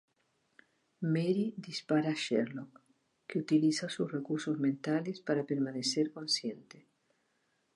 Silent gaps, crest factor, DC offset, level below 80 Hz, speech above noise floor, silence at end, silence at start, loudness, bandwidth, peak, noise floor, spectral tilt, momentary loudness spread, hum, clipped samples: none; 18 dB; under 0.1%; -84 dBFS; 44 dB; 0.95 s; 1 s; -33 LUFS; 11.5 kHz; -18 dBFS; -77 dBFS; -5 dB/octave; 10 LU; none; under 0.1%